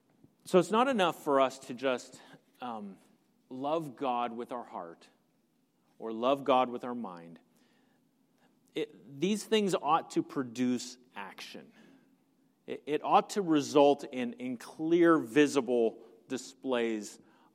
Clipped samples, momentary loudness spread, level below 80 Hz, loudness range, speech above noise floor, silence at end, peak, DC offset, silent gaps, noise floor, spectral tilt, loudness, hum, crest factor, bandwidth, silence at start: under 0.1%; 19 LU; -86 dBFS; 9 LU; 42 dB; 0.4 s; -10 dBFS; under 0.1%; none; -73 dBFS; -5 dB/octave; -31 LUFS; none; 22 dB; 15.5 kHz; 0.45 s